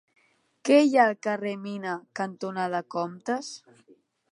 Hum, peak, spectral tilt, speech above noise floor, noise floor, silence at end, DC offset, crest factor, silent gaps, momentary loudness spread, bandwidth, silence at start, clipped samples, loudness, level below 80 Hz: none; -6 dBFS; -5 dB/octave; 23 dB; -49 dBFS; 0.75 s; under 0.1%; 22 dB; none; 14 LU; 11.5 kHz; 0.65 s; under 0.1%; -26 LUFS; -84 dBFS